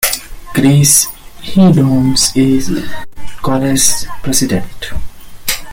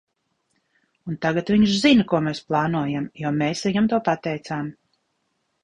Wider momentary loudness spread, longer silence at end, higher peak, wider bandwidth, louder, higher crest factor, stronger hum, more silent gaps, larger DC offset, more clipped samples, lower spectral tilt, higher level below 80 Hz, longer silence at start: first, 17 LU vs 13 LU; second, 0 s vs 0.9 s; first, 0 dBFS vs -4 dBFS; first, over 20 kHz vs 10.5 kHz; first, -12 LUFS vs -22 LUFS; second, 12 dB vs 18 dB; neither; neither; neither; neither; second, -4 dB/octave vs -6 dB/octave; first, -32 dBFS vs -56 dBFS; second, 0 s vs 1.05 s